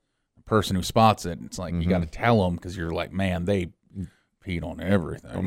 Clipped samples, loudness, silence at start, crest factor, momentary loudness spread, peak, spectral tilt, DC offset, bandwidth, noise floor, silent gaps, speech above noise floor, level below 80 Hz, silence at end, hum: under 0.1%; -25 LUFS; 0.45 s; 20 dB; 16 LU; -6 dBFS; -6 dB/octave; under 0.1%; 16 kHz; -52 dBFS; none; 28 dB; -44 dBFS; 0 s; none